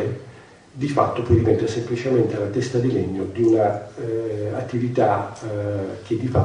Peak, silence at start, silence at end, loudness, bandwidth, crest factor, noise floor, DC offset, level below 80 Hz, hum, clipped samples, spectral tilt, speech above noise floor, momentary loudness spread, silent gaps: -4 dBFS; 0 s; 0 s; -22 LUFS; 10 kHz; 18 dB; -45 dBFS; under 0.1%; -46 dBFS; none; under 0.1%; -8 dB/octave; 24 dB; 10 LU; none